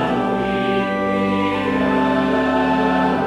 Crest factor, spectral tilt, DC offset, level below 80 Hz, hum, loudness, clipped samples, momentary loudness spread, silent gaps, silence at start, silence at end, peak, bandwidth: 14 dB; -7 dB/octave; under 0.1%; -44 dBFS; none; -18 LUFS; under 0.1%; 3 LU; none; 0 s; 0 s; -4 dBFS; 10.5 kHz